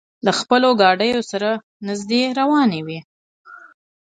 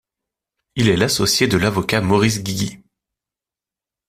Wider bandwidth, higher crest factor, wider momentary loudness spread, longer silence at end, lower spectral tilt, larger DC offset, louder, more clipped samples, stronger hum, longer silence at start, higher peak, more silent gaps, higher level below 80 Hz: second, 9.4 kHz vs 16 kHz; about the same, 18 dB vs 18 dB; first, 13 LU vs 9 LU; second, 0.55 s vs 1.3 s; about the same, -4.5 dB/octave vs -4.5 dB/octave; neither; about the same, -18 LUFS vs -17 LUFS; neither; neither; second, 0.25 s vs 0.75 s; about the same, 0 dBFS vs -2 dBFS; first, 1.63-1.80 s, 3.04-3.44 s vs none; second, -64 dBFS vs -46 dBFS